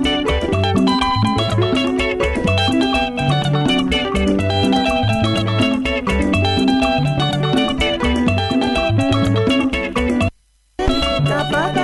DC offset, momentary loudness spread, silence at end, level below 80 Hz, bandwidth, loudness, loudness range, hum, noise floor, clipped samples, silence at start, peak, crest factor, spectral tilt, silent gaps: under 0.1%; 3 LU; 0 s; -30 dBFS; 11.5 kHz; -17 LUFS; 1 LU; none; -49 dBFS; under 0.1%; 0 s; -4 dBFS; 14 dB; -6 dB/octave; none